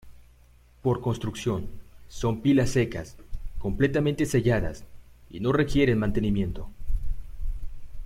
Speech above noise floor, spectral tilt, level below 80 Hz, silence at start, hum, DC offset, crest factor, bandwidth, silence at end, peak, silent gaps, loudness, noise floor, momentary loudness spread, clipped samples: 30 dB; -6.5 dB/octave; -36 dBFS; 0.05 s; 60 Hz at -45 dBFS; under 0.1%; 16 dB; 15 kHz; 0 s; -10 dBFS; none; -26 LUFS; -55 dBFS; 20 LU; under 0.1%